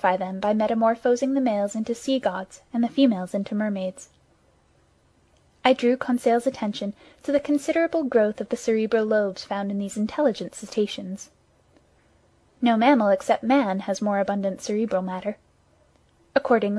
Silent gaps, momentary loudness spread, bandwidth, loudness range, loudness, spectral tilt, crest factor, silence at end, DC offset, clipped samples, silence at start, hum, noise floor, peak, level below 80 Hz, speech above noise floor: none; 10 LU; 12.5 kHz; 4 LU; -24 LUFS; -5.5 dB/octave; 22 dB; 0 s; under 0.1%; under 0.1%; 0.05 s; none; -61 dBFS; -2 dBFS; -64 dBFS; 38 dB